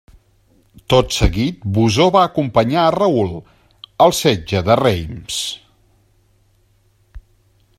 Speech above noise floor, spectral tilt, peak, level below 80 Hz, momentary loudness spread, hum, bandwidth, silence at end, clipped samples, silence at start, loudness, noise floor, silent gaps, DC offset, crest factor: 42 dB; -5 dB/octave; 0 dBFS; -34 dBFS; 11 LU; none; 16 kHz; 0.6 s; under 0.1%; 0.9 s; -16 LUFS; -57 dBFS; none; under 0.1%; 18 dB